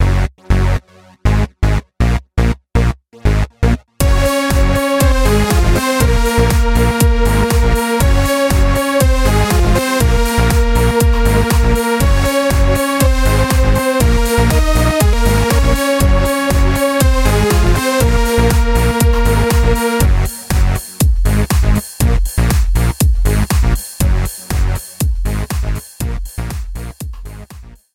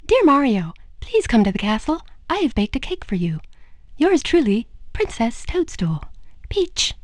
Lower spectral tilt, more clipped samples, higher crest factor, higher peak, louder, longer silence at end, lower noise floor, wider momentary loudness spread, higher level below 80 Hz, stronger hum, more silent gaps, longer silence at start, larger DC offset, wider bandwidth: about the same, -5.5 dB/octave vs -5 dB/octave; neither; about the same, 12 dB vs 16 dB; first, 0 dBFS vs -4 dBFS; first, -14 LUFS vs -20 LUFS; about the same, 0.2 s vs 0.1 s; about the same, -36 dBFS vs -39 dBFS; second, 7 LU vs 11 LU; first, -16 dBFS vs -36 dBFS; neither; neither; about the same, 0 s vs 0.05 s; neither; first, 17 kHz vs 11 kHz